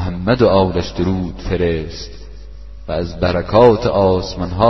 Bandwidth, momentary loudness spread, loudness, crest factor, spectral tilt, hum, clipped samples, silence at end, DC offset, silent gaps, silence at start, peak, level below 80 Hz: 6.2 kHz; 14 LU; -16 LUFS; 16 dB; -7 dB/octave; none; under 0.1%; 0 s; 1%; none; 0 s; 0 dBFS; -32 dBFS